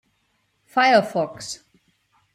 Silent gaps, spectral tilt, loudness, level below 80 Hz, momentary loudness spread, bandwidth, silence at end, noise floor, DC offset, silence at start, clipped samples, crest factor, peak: none; -3.5 dB/octave; -20 LUFS; -68 dBFS; 17 LU; 15 kHz; 0.8 s; -69 dBFS; under 0.1%; 0.75 s; under 0.1%; 18 dB; -6 dBFS